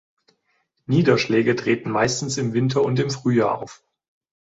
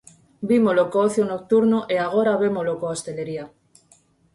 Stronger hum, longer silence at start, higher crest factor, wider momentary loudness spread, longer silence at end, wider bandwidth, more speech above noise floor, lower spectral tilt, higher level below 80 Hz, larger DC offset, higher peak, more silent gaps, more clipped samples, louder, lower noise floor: neither; first, 0.9 s vs 0.4 s; about the same, 18 dB vs 14 dB; second, 6 LU vs 13 LU; about the same, 0.85 s vs 0.9 s; second, 8 kHz vs 11.5 kHz; first, 50 dB vs 38 dB; about the same, -5.5 dB/octave vs -6 dB/octave; first, -56 dBFS vs -64 dBFS; neither; first, -4 dBFS vs -8 dBFS; neither; neither; about the same, -21 LUFS vs -21 LUFS; first, -70 dBFS vs -58 dBFS